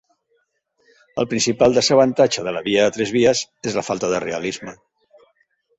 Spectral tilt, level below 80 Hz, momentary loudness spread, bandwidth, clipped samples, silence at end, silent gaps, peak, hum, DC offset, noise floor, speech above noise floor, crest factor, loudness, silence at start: -4 dB/octave; -56 dBFS; 12 LU; 8.2 kHz; under 0.1%; 1.05 s; none; -2 dBFS; none; under 0.1%; -67 dBFS; 49 dB; 18 dB; -18 LUFS; 1.15 s